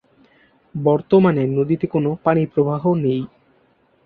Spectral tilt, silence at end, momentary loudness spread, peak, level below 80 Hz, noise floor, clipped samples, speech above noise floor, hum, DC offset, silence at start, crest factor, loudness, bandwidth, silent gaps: -11.5 dB/octave; 0.8 s; 8 LU; -2 dBFS; -56 dBFS; -59 dBFS; under 0.1%; 41 dB; none; under 0.1%; 0.75 s; 18 dB; -18 LUFS; 4.7 kHz; none